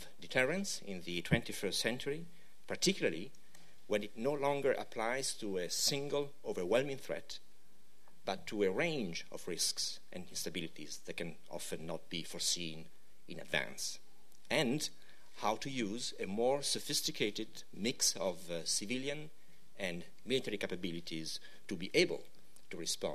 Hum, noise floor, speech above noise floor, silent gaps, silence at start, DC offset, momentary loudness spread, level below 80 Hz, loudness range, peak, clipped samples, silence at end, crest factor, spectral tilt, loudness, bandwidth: none; -70 dBFS; 32 dB; none; 0 s; 0.6%; 13 LU; -66 dBFS; 5 LU; -16 dBFS; under 0.1%; 0 s; 22 dB; -3 dB/octave; -37 LUFS; 14 kHz